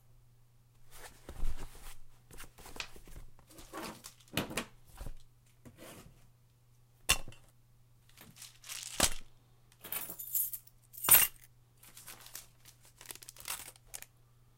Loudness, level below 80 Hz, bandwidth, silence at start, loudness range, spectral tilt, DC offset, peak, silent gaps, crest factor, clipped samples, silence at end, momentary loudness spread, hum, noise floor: -32 LUFS; -48 dBFS; 17 kHz; 0.8 s; 18 LU; -1 dB/octave; under 0.1%; -8 dBFS; none; 30 dB; under 0.1%; 0.55 s; 23 LU; none; -65 dBFS